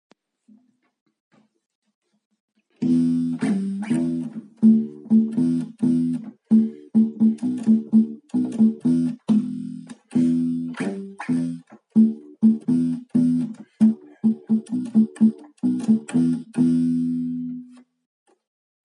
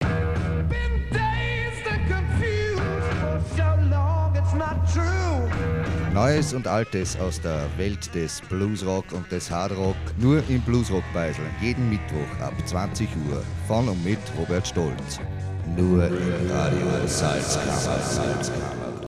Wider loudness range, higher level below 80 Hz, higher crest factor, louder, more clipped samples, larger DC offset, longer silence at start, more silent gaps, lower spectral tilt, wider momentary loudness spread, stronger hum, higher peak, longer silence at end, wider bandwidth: about the same, 5 LU vs 3 LU; second, -76 dBFS vs -34 dBFS; about the same, 16 dB vs 16 dB; first, -22 LUFS vs -25 LUFS; neither; neither; first, 2.8 s vs 0 s; neither; first, -8.5 dB/octave vs -6 dB/octave; first, 10 LU vs 7 LU; neither; about the same, -6 dBFS vs -8 dBFS; first, 1.2 s vs 0 s; second, 10 kHz vs 13 kHz